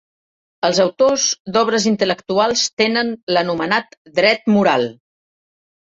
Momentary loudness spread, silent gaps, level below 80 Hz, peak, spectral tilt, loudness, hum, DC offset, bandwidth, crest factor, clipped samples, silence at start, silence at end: 5 LU; 1.40-1.45 s, 2.73-2.77 s, 3.23-3.27 s, 3.97-4.05 s; -60 dBFS; -2 dBFS; -3.5 dB/octave; -17 LUFS; none; under 0.1%; 8 kHz; 16 dB; under 0.1%; 0.65 s; 1 s